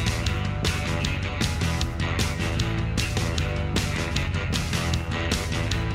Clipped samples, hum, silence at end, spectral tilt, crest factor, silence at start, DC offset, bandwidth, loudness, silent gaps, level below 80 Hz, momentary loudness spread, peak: under 0.1%; none; 0 s; -4.5 dB/octave; 18 dB; 0 s; under 0.1%; 16 kHz; -26 LUFS; none; -32 dBFS; 1 LU; -8 dBFS